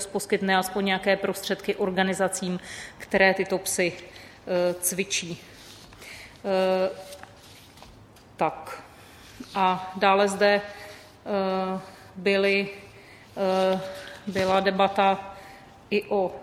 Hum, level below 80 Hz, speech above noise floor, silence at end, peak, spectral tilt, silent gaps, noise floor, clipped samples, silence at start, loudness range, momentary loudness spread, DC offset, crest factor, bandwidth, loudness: none; -60 dBFS; 25 dB; 0 s; -4 dBFS; -4 dB/octave; none; -50 dBFS; under 0.1%; 0 s; 6 LU; 21 LU; under 0.1%; 22 dB; 15.5 kHz; -25 LUFS